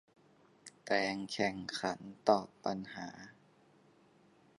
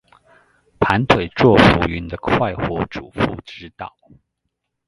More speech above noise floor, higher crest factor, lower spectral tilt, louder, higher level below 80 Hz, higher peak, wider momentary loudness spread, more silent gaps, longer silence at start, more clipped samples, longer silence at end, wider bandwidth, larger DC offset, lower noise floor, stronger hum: second, 30 dB vs 58 dB; first, 26 dB vs 20 dB; second, -4.5 dB/octave vs -7 dB/octave; second, -36 LUFS vs -17 LUFS; second, -74 dBFS vs -36 dBFS; second, -12 dBFS vs 0 dBFS; about the same, 22 LU vs 22 LU; neither; second, 0.65 s vs 0.8 s; neither; first, 1.3 s vs 1 s; about the same, 11.5 kHz vs 11.5 kHz; neither; second, -66 dBFS vs -76 dBFS; neither